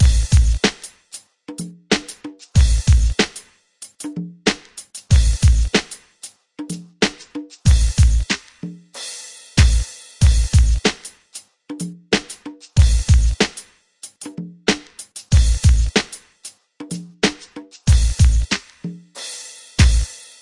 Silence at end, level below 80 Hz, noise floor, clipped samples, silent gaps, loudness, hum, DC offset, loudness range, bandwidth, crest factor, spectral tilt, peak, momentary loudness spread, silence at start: 0.25 s; -20 dBFS; -43 dBFS; under 0.1%; none; -18 LUFS; none; under 0.1%; 2 LU; 11.5 kHz; 18 dB; -4.5 dB/octave; 0 dBFS; 21 LU; 0 s